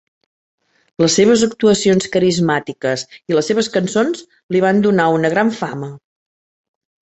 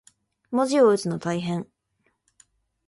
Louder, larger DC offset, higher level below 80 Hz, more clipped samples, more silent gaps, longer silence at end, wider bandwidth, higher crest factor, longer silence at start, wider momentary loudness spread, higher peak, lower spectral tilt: first, -16 LUFS vs -23 LUFS; neither; first, -56 dBFS vs -68 dBFS; neither; first, 4.43-4.49 s vs none; about the same, 1.2 s vs 1.25 s; second, 8.2 kHz vs 11.5 kHz; about the same, 16 dB vs 18 dB; first, 1 s vs 0.5 s; about the same, 11 LU vs 13 LU; first, -2 dBFS vs -8 dBFS; second, -4.5 dB/octave vs -6 dB/octave